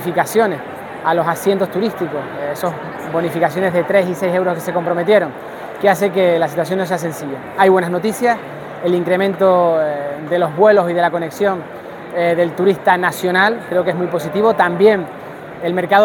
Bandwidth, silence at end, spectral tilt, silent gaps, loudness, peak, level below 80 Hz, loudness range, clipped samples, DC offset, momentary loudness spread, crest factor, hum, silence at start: 18 kHz; 0 s; -5.5 dB/octave; none; -16 LUFS; 0 dBFS; -60 dBFS; 3 LU; under 0.1%; under 0.1%; 12 LU; 16 dB; none; 0 s